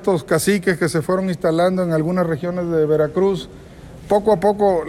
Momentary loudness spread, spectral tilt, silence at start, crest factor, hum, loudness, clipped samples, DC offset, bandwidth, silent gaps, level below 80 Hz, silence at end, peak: 5 LU; -6 dB/octave; 0 s; 14 dB; none; -18 LUFS; under 0.1%; under 0.1%; 15.5 kHz; none; -46 dBFS; 0 s; -4 dBFS